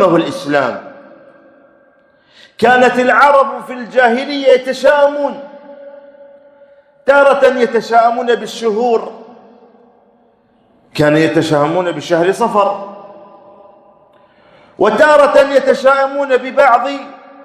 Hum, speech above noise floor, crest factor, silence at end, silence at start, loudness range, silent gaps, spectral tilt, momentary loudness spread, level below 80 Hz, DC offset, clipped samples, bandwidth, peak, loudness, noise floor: none; 41 dB; 14 dB; 0.3 s; 0 s; 5 LU; none; -5 dB/octave; 13 LU; -56 dBFS; under 0.1%; 0.4%; 13 kHz; 0 dBFS; -12 LUFS; -52 dBFS